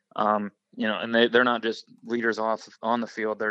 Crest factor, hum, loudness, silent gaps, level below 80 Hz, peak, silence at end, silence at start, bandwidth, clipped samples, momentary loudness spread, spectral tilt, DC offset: 20 dB; none; -25 LUFS; none; -82 dBFS; -6 dBFS; 0 s; 0.15 s; 8 kHz; under 0.1%; 11 LU; -5 dB/octave; under 0.1%